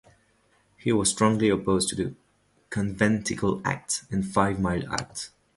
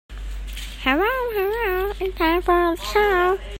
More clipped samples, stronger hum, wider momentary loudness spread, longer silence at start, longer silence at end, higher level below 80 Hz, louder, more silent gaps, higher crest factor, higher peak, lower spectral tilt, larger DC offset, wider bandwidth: neither; neither; second, 10 LU vs 15 LU; first, 0.85 s vs 0.1 s; first, 0.3 s vs 0 s; second, -50 dBFS vs -34 dBFS; second, -26 LUFS vs -21 LUFS; neither; about the same, 22 dB vs 18 dB; second, -6 dBFS vs -2 dBFS; about the same, -4.5 dB/octave vs -5 dB/octave; neither; second, 11.5 kHz vs 16.5 kHz